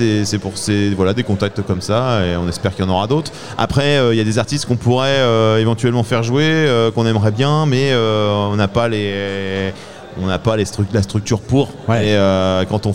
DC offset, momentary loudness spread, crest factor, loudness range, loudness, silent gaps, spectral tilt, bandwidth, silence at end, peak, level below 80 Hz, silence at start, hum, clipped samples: 1%; 7 LU; 14 dB; 4 LU; -16 LUFS; none; -6 dB/octave; 13 kHz; 0 s; -2 dBFS; -42 dBFS; 0 s; none; under 0.1%